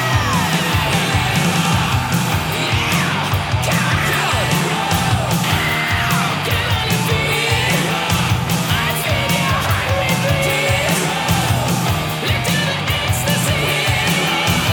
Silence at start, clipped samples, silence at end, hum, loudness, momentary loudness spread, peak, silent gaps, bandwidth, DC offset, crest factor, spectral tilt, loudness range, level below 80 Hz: 0 s; under 0.1%; 0 s; none; -16 LUFS; 2 LU; -2 dBFS; none; over 20 kHz; under 0.1%; 14 dB; -4 dB/octave; 0 LU; -34 dBFS